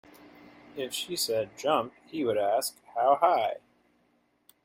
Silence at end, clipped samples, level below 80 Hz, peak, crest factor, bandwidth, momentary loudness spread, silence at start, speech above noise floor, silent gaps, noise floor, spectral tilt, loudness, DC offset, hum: 1.05 s; under 0.1%; -74 dBFS; -10 dBFS; 20 dB; 16 kHz; 14 LU; 0.75 s; 42 dB; none; -70 dBFS; -3 dB/octave; -28 LUFS; under 0.1%; 60 Hz at -65 dBFS